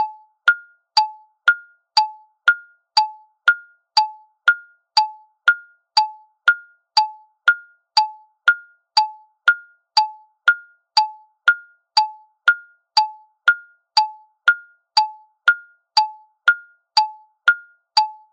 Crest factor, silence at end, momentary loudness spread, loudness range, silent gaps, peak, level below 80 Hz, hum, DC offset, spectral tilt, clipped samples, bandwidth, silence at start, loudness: 20 dB; 0.2 s; 7 LU; 0 LU; none; 0 dBFS; under -90 dBFS; none; under 0.1%; 8 dB/octave; under 0.1%; 9.6 kHz; 0 s; -20 LUFS